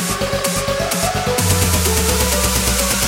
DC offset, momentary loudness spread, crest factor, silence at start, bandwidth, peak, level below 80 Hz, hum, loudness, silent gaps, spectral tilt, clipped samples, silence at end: under 0.1%; 4 LU; 16 dB; 0 s; 16.5 kHz; -2 dBFS; -26 dBFS; none; -16 LUFS; none; -3 dB/octave; under 0.1%; 0 s